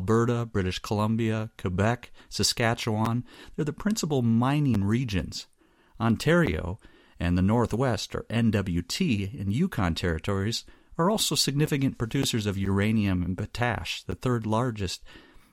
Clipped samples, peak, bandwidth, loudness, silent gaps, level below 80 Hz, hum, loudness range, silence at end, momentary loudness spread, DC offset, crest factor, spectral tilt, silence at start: under 0.1%; -10 dBFS; 16.5 kHz; -27 LUFS; none; -46 dBFS; none; 1 LU; 0.35 s; 9 LU; under 0.1%; 16 dB; -5.5 dB/octave; 0 s